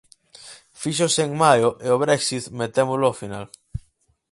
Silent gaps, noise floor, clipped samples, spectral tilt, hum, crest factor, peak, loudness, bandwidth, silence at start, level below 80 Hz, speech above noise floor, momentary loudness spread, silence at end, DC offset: none; -62 dBFS; under 0.1%; -4 dB/octave; none; 20 dB; -2 dBFS; -20 LUFS; 11.5 kHz; 0.45 s; -52 dBFS; 42 dB; 21 LU; 0.5 s; under 0.1%